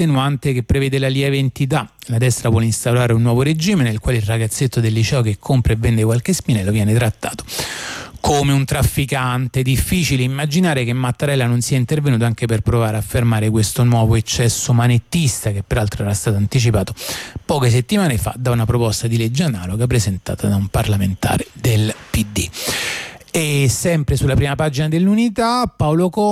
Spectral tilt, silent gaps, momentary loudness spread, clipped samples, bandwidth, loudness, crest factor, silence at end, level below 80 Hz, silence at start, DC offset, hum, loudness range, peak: -5.5 dB/octave; none; 5 LU; under 0.1%; 15.5 kHz; -17 LUFS; 10 dB; 0 s; -34 dBFS; 0 s; under 0.1%; none; 2 LU; -6 dBFS